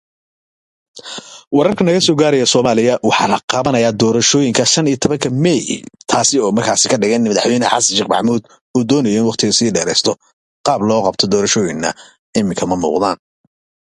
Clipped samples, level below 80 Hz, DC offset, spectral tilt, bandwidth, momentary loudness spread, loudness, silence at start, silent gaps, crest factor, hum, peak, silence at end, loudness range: under 0.1%; -50 dBFS; under 0.1%; -3.5 dB/octave; 11.5 kHz; 9 LU; -14 LUFS; 0.95 s; 1.47-1.51 s, 3.43-3.48 s, 8.61-8.74 s, 10.33-10.64 s, 12.19-12.33 s; 14 dB; none; 0 dBFS; 0.8 s; 3 LU